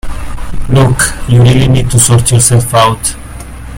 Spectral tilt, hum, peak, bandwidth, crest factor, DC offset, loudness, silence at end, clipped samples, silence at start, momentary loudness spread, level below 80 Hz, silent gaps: -4.5 dB/octave; none; 0 dBFS; over 20 kHz; 8 dB; under 0.1%; -8 LUFS; 0 s; 0.5%; 0.05 s; 17 LU; -22 dBFS; none